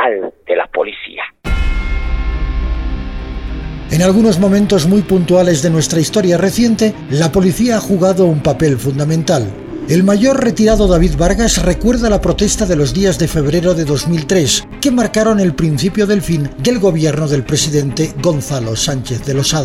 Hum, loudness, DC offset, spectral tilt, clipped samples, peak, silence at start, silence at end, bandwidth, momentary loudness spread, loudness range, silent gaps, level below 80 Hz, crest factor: none; -13 LUFS; under 0.1%; -5.5 dB/octave; under 0.1%; 0 dBFS; 0 s; 0 s; 16 kHz; 9 LU; 4 LU; none; -24 dBFS; 12 dB